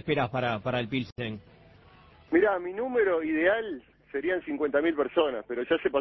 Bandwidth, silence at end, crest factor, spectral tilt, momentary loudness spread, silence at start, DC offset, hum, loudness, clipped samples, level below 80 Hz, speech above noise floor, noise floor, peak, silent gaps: 6 kHz; 0 s; 18 dB; -8 dB/octave; 11 LU; 0.05 s; under 0.1%; none; -28 LUFS; under 0.1%; -60 dBFS; 28 dB; -55 dBFS; -10 dBFS; 1.12-1.16 s